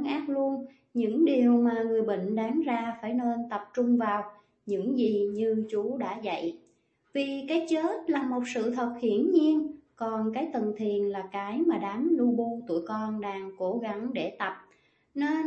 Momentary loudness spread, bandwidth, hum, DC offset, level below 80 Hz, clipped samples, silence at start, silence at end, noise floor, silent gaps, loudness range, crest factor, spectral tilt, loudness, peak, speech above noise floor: 10 LU; 8.4 kHz; none; under 0.1%; -76 dBFS; under 0.1%; 0 s; 0 s; -68 dBFS; none; 4 LU; 16 dB; -6.5 dB/octave; -29 LUFS; -12 dBFS; 40 dB